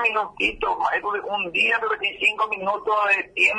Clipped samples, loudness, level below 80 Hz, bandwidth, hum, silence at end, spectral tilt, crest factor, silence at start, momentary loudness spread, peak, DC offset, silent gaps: under 0.1%; -21 LUFS; -52 dBFS; 10.5 kHz; none; 0 s; -2.5 dB/octave; 14 dB; 0 s; 5 LU; -8 dBFS; under 0.1%; none